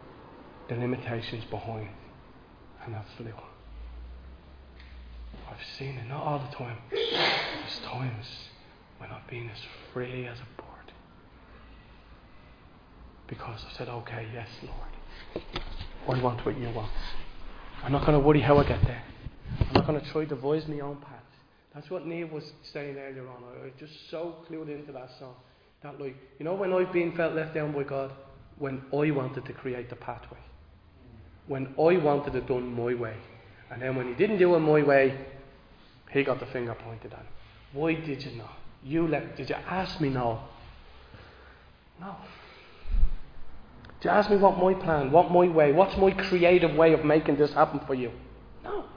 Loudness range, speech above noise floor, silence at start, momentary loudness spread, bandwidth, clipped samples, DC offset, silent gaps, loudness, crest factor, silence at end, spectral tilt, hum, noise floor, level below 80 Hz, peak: 19 LU; 31 dB; 0 s; 25 LU; 5.2 kHz; under 0.1%; under 0.1%; none; -27 LUFS; 24 dB; 0 s; -8 dB/octave; none; -59 dBFS; -42 dBFS; -4 dBFS